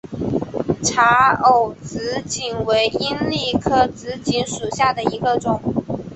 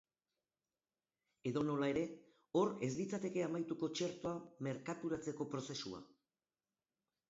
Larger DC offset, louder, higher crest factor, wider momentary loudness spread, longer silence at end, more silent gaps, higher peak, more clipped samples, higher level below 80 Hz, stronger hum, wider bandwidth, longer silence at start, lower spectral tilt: neither; first, -19 LUFS vs -41 LUFS; about the same, 18 dB vs 18 dB; about the same, 11 LU vs 9 LU; second, 0 s vs 1.25 s; neither; first, -2 dBFS vs -24 dBFS; neither; first, -46 dBFS vs -76 dBFS; neither; first, 8.6 kHz vs 7.6 kHz; second, 0.1 s vs 1.45 s; second, -4 dB/octave vs -5.5 dB/octave